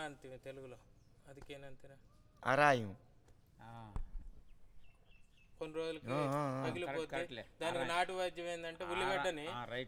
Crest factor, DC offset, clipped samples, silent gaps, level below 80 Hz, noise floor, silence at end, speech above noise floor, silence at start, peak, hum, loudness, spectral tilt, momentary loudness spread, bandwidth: 24 dB; under 0.1%; under 0.1%; none; -58 dBFS; -65 dBFS; 0 s; 25 dB; 0 s; -16 dBFS; none; -38 LUFS; -5 dB/octave; 21 LU; 17 kHz